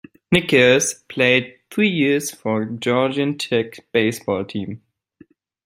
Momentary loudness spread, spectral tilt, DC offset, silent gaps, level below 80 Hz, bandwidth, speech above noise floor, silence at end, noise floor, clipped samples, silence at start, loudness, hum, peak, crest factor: 11 LU; -4 dB/octave; under 0.1%; none; -56 dBFS; 16 kHz; 33 dB; 0.9 s; -52 dBFS; under 0.1%; 0.3 s; -19 LUFS; none; -2 dBFS; 18 dB